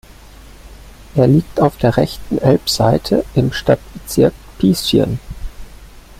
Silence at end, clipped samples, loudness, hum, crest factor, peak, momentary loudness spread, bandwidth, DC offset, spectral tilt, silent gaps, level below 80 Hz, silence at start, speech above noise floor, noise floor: 0.2 s; under 0.1%; -15 LUFS; none; 14 dB; -2 dBFS; 9 LU; 16.5 kHz; under 0.1%; -6 dB/octave; none; -34 dBFS; 0.5 s; 24 dB; -39 dBFS